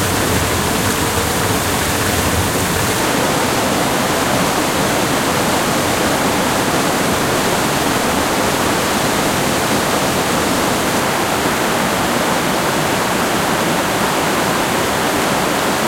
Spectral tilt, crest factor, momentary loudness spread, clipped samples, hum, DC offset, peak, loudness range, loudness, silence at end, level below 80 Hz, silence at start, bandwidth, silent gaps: -3.5 dB/octave; 14 dB; 1 LU; under 0.1%; none; under 0.1%; -2 dBFS; 0 LU; -15 LUFS; 0 s; -38 dBFS; 0 s; 16.5 kHz; none